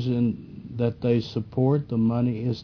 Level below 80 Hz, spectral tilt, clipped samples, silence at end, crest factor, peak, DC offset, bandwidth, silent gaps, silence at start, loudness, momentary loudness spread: -54 dBFS; -9.5 dB/octave; under 0.1%; 0 s; 14 dB; -10 dBFS; under 0.1%; 5.4 kHz; none; 0 s; -25 LUFS; 7 LU